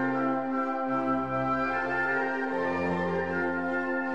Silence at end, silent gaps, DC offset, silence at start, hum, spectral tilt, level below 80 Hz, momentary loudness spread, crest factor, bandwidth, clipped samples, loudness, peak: 0 s; none; 0.3%; 0 s; none; -7.5 dB/octave; -60 dBFS; 2 LU; 12 dB; 8 kHz; under 0.1%; -29 LUFS; -18 dBFS